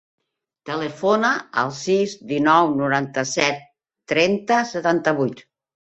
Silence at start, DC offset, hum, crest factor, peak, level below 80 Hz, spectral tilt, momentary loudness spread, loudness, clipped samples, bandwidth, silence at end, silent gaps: 0.65 s; under 0.1%; none; 20 dB; -2 dBFS; -64 dBFS; -4.5 dB/octave; 10 LU; -20 LUFS; under 0.1%; 8.4 kHz; 0.45 s; none